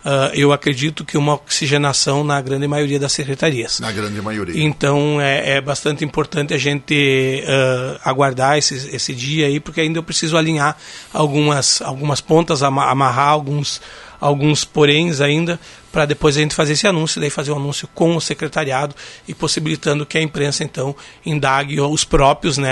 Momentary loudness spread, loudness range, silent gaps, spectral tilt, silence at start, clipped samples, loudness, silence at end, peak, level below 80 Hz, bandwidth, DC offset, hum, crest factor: 8 LU; 3 LU; none; -4 dB/octave; 0.05 s; under 0.1%; -17 LUFS; 0 s; 0 dBFS; -40 dBFS; 11.5 kHz; under 0.1%; none; 16 dB